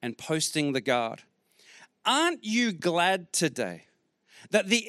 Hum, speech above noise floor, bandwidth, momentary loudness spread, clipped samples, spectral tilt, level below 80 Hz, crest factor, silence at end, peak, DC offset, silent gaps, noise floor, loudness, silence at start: none; 34 dB; 15.5 kHz; 10 LU; under 0.1%; -3 dB/octave; -80 dBFS; 20 dB; 0 s; -10 dBFS; under 0.1%; none; -62 dBFS; -27 LUFS; 0 s